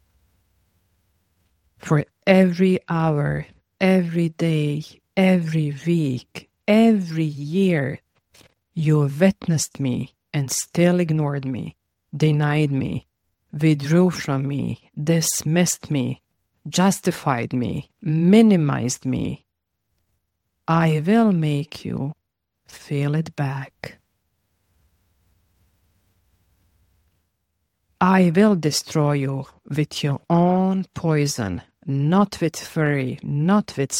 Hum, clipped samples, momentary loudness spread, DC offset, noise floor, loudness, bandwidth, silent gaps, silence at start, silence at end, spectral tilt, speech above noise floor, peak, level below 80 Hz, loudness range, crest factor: none; under 0.1%; 13 LU; under 0.1%; -77 dBFS; -21 LUFS; 17 kHz; none; 1.85 s; 0 s; -6 dB/octave; 57 dB; 0 dBFS; -56 dBFS; 4 LU; 22 dB